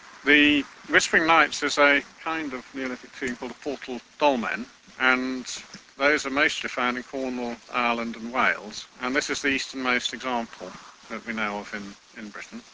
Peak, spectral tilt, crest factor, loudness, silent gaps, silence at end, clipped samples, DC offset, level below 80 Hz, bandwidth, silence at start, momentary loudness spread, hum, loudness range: -2 dBFS; -2.5 dB/octave; 24 dB; -24 LUFS; none; 0.1 s; under 0.1%; under 0.1%; -60 dBFS; 8 kHz; 0.05 s; 18 LU; none; 5 LU